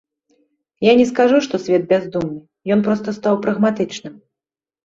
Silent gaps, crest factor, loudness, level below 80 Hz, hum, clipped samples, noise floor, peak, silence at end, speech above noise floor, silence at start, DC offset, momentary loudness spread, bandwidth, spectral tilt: none; 16 dB; -17 LUFS; -58 dBFS; none; under 0.1%; -89 dBFS; -2 dBFS; 0.75 s; 73 dB; 0.8 s; under 0.1%; 13 LU; 7.8 kHz; -6 dB/octave